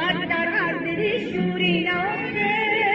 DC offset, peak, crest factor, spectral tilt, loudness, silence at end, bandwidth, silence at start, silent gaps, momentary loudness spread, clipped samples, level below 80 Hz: under 0.1%; -8 dBFS; 16 dB; -7 dB/octave; -22 LUFS; 0 s; 7.4 kHz; 0 s; none; 4 LU; under 0.1%; -56 dBFS